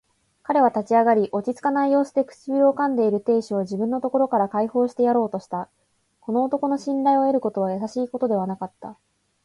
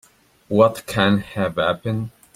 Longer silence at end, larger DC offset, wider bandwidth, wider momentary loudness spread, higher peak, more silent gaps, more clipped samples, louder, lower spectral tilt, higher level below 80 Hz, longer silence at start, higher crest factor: first, 0.5 s vs 0.25 s; neither; second, 11.5 kHz vs 15.5 kHz; first, 12 LU vs 8 LU; second, -6 dBFS vs -2 dBFS; neither; neither; about the same, -22 LUFS vs -20 LUFS; first, -7.5 dB/octave vs -6 dB/octave; second, -68 dBFS vs -52 dBFS; about the same, 0.5 s vs 0.5 s; about the same, 16 dB vs 18 dB